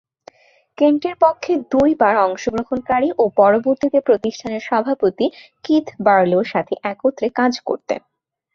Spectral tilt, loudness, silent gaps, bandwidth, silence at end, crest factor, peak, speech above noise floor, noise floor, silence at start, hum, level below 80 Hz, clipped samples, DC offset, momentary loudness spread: -6 dB/octave; -18 LUFS; none; 7.2 kHz; 0.55 s; 16 dB; -2 dBFS; 32 dB; -49 dBFS; 0.8 s; none; -54 dBFS; under 0.1%; under 0.1%; 9 LU